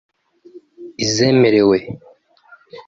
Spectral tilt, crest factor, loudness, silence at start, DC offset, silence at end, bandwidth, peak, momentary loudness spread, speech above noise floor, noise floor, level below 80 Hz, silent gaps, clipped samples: -5 dB/octave; 16 dB; -15 LUFS; 0.55 s; under 0.1%; 0.05 s; 7.8 kHz; -2 dBFS; 23 LU; 35 dB; -49 dBFS; -54 dBFS; none; under 0.1%